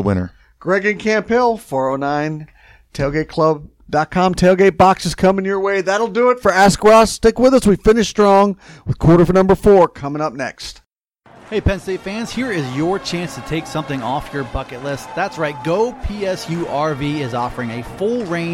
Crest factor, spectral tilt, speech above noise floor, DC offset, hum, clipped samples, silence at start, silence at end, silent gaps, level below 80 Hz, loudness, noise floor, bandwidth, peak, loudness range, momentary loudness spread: 16 dB; -6 dB/octave; 37 dB; under 0.1%; none; under 0.1%; 0 s; 0 s; none; -36 dBFS; -16 LUFS; -52 dBFS; 16.5 kHz; 0 dBFS; 10 LU; 13 LU